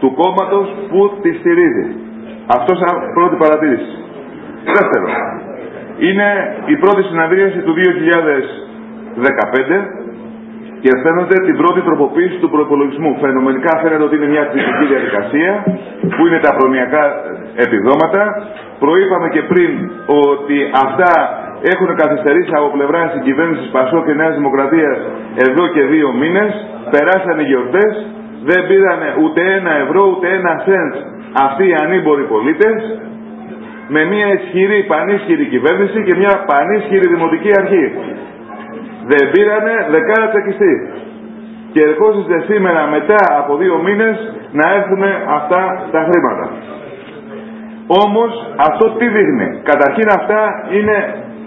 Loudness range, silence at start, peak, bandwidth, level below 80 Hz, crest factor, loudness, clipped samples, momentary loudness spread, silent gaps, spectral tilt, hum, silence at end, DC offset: 2 LU; 0 s; 0 dBFS; 4 kHz; -56 dBFS; 12 dB; -12 LUFS; under 0.1%; 16 LU; none; -8.5 dB/octave; none; 0 s; under 0.1%